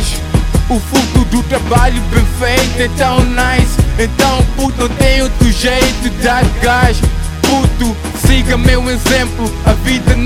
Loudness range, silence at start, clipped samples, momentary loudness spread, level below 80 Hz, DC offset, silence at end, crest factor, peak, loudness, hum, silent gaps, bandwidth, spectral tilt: 1 LU; 0 s; 0.2%; 4 LU; -16 dBFS; under 0.1%; 0 s; 10 dB; 0 dBFS; -12 LUFS; none; none; 16.5 kHz; -5 dB/octave